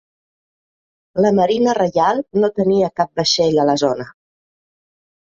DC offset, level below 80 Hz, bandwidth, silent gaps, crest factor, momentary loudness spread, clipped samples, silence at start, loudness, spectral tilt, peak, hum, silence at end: under 0.1%; -56 dBFS; 7.8 kHz; none; 16 dB; 6 LU; under 0.1%; 1.15 s; -17 LUFS; -5 dB/octave; -2 dBFS; none; 1.15 s